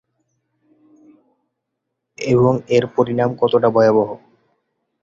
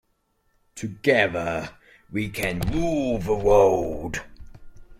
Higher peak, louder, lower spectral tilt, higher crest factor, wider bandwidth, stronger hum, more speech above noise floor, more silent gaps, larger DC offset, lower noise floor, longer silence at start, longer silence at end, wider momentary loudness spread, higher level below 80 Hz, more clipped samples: first, -2 dBFS vs -6 dBFS; first, -16 LUFS vs -23 LUFS; first, -7.5 dB/octave vs -5.5 dB/octave; about the same, 18 dB vs 20 dB; second, 7.6 kHz vs 16.5 kHz; neither; first, 62 dB vs 47 dB; neither; neither; first, -77 dBFS vs -69 dBFS; first, 2.2 s vs 0.75 s; first, 0.85 s vs 0.05 s; second, 10 LU vs 16 LU; second, -54 dBFS vs -40 dBFS; neither